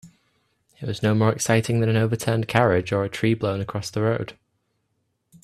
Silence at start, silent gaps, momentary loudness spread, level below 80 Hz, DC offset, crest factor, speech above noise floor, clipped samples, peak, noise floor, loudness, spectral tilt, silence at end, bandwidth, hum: 0.05 s; none; 9 LU; -56 dBFS; under 0.1%; 22 dB; 51 dB; under 0.1%; 0 dBFS; -73 dBFS; -22 LUFS; -6 dB/octave; 1.1 s; 13.5 kHz; none